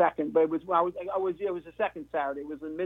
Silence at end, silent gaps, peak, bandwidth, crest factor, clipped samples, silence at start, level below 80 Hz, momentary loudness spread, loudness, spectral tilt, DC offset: 0 s; none; -12 dBFS; 3.9 kHz; 18 dB; under 0.1%; 0 s; -64 dBFS; 8 LU; -30 LUFS; -8 dB/octave; under 0.1%